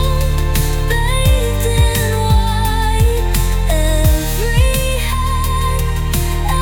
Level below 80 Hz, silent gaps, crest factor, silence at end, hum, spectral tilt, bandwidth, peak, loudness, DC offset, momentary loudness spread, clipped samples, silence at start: -16 dBFS; none; 12 dB; 0 s; none; -4.5 dB/octave; 19.5 kHz; -2 dBFS; -16 LUFS; under 0.1%; 3 LU; under 0.1%; 0 s